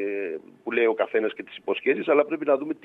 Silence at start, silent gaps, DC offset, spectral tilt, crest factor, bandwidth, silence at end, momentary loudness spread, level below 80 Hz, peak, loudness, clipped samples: 0 s; none; under 0.1%; -7 dB/octave; 20 dB; 4 kHz; 0.1 s; 11 LU; -80 dBFS; -4 dBFS; -25 LUFS; under 0.1%